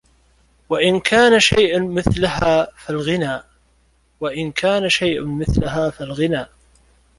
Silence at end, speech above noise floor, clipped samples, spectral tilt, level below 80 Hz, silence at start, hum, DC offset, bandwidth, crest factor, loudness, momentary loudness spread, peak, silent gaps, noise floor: 0.7 s; 41 dB; under 0.1%; -4.5 dB/octave; -36 dBFS; 0.7 s; none; under 0.1%; 11.5 kHz; 18 dB; -18 LUFS; 12 LU; -2 dBFS; none; -58 dBFS